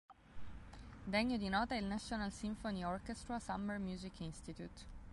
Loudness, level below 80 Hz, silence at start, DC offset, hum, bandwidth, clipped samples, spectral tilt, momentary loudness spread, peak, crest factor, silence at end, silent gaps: -42 LUFS; -56 dBFS; 0.1 s; under 0.1%; none; 11.5 kHz; under 0.1%; -5 dB/octave; 19 LU; -24 dBFS; 20 dB; 0 s; none